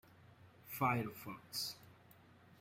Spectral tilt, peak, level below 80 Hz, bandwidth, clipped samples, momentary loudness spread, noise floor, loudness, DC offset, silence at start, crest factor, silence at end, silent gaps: -4.5 dB/octave; -22 dBFS; -76 dBFS; 16 kHz; under 0.1%; 22 LU; -64 dBFS; -41 LUFS; under 0.1%; 0.2 s; 22 dB; 0.05 s; none